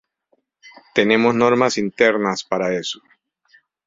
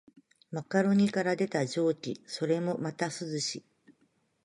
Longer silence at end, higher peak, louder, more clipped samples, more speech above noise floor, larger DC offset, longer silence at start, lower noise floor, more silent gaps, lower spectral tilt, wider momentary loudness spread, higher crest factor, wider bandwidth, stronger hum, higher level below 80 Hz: first, 0.9 s vs 0.55 s; first, -2 dBFS vs -14 dBFS; first, -18 LUFS vs -31 LUFS; neither; first, 49 dB vs 42 dB; neither; first, 0.65 s vs 0.5 s; second, -67 dBFS vs -72 dBFS; neither; about the same, -4.5 dB/octave vs -5.5 dB/octave; second, 9 LU vs 12 LU; about the same, 18 dB vs 16 dB; second, 7.8 kHz vs 11.5 kHz; neither; first, -60 dBFS vs -76 dBFS